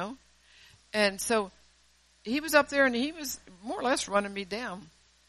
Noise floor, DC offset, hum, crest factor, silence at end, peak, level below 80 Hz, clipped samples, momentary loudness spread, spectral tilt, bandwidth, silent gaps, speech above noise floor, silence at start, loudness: -64 dBFS; under 0.1%; none; 22 dB; 0.4 s; -8 dBFS; -62 dBFS; under 0.1%; 15 LU; -3 dB/octave; 13 kHz; none; 35 dB; 0 s; -29 LUFS